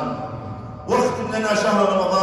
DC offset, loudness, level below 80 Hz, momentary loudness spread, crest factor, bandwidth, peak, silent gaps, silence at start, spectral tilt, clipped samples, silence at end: under 0.1%; -20 LUFS; -50 dBFS; 15 LU; 16 dB; 14.5 kHz; -6 dBFS; none; 0 s; -5 dB/octave; under 0.1%; 0 s